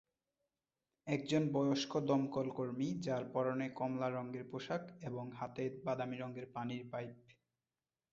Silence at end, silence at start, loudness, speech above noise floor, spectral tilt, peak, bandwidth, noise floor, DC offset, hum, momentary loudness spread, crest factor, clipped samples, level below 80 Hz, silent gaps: 0.8 s; 1.05 s; -40 LUFS; over 51 dB; -5.5 dB/octave; -22 dBFS; 7.6 kHz; under -90 dBFS; under 0.1%; none; 10 LU; 20 dB; under 0.1%; -78 dBFS; none